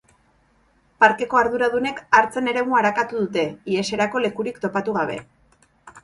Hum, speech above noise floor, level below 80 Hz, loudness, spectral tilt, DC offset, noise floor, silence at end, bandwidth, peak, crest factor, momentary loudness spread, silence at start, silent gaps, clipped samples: none; 40 dB; -60 dBFS; -21 LUFS; -4.5 dB/octave; under 0.1%; -60 dBFS; 0.05 s; 11.5 kHz; 0 dBFS; 22 dB; 8 LU; 1 s; none; under 0.1%